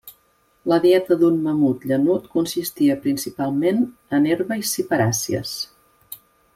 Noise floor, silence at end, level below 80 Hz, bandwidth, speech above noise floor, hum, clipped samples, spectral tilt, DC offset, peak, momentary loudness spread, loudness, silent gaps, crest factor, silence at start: -61 dBFS; 0.4 s; -60 dBFS; 16.5 kHz; 42 dB; none; under 0.1%; -5 dB/octave; under 0.1%; -6 dBFS; 13 LU; -20 LUFS; none; 16 dB; 0.05 s